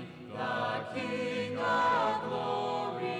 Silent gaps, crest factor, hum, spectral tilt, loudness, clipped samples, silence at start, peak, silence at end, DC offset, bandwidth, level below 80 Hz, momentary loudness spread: none; 14 dB; none; -5.5 dB/octave; -32 LUFS; under 0.1%; 0 s; -18 dBFS; 0 s; under 0.1%; 11.5 kHz; -70 dBFS; 8 LU